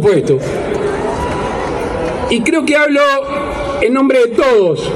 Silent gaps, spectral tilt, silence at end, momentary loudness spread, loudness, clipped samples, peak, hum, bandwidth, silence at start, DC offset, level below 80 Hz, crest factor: none; -5.5 dB/octave; 0 s; 8 LU; -13 LUFS; under 0.1%; 0 dBFS; none; 13 kHz; 0 s; under 0.1%; -34 dBFS; 12 dB